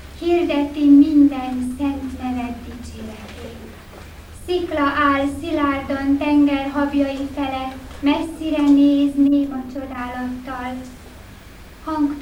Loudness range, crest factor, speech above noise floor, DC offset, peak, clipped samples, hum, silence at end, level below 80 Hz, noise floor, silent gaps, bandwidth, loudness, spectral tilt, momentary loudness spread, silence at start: 6 LU; 16 dB; 23 dB; under 0.1%; -4 dBFS; under 0.1%; none; 0 s; -40 dBFS; -40 dBFS; none; 11.5 kHz; -19 LUFS; -6 dB/octave; 21 LU; 0 s